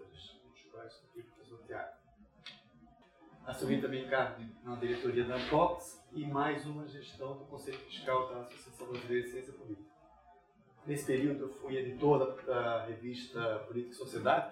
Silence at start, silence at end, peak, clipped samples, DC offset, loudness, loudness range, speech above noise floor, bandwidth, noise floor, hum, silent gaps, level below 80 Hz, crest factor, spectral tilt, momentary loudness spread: 0 s; 0 s; -16 dBFS; under 0.1%; under 0.1%; -37 LUFS; 7 LU; 28 dB; 16 kHz; -65 dBFS; none; none; -68 dBFS; 22 dB; -6 dB/octave; 21 LU